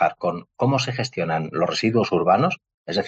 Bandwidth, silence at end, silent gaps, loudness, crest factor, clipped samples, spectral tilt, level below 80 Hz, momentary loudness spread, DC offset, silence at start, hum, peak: 8.6 kHz; 0 s; 2.74-2.84 s; -22 LUFS; 16 dB; under 0.1%; -5.5 dB/octave; -62 dBFS; 8 LU; under 0.1%; 0 s; none; -6 dBFS